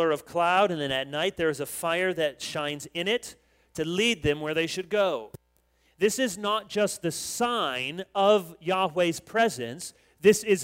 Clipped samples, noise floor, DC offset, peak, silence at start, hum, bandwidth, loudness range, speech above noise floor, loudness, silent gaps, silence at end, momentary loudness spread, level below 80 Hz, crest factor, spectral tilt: under 0.1%; -67 dBFS; under 0.1%; -8 dBFS; 0 s; none; 16 kHz; 2 LU; 41 dB; -27 LUFS; none; 0 s; 9 LU; -58 dBFS; 20 dB; -3.5 dB/octave